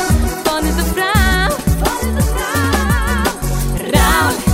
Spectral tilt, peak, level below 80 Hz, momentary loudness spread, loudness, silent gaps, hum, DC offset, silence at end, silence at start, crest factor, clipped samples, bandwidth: -4.5 dB/octave; 0 dBFS; -20 dBFS; 5 LU; -15 LUFS; none; none; under 0.1%; 0 s; 0 s; 14 dB; under 0.1%; 16.5 kHz